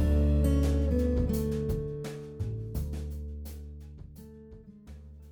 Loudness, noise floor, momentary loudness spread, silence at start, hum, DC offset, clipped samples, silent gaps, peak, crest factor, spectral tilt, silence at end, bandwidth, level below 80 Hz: -31 LUFS; -50 dBFS; 23 LU; 0 s; none; under 0.1%; under 0.1%; none; -16 dBFS; 14 dB; -8 dB/octave; 0 s; 19.5 kHz; -32 dBFS